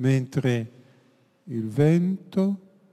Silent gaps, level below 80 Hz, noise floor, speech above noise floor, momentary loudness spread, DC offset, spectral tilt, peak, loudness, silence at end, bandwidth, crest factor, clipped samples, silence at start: none; -66 dBFS; -61 dBFS; 38 dB; 14 LU; under 0.1%; -8 dB/octave; -8 dBFS; -25 LUFS; 0.35 s; 12.5 kHz; 16 dB; under 0.1%; 0 s